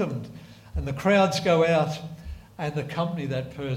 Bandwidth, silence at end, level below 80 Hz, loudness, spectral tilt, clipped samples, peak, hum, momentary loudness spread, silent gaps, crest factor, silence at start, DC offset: 16 kHz; 0 s; -44 dBFS; -25 LUFS; -6 dB/octave; under 0.1%; -8 dBFS; none; 20 LU; none; 18 dB; 0 s; under 0.1%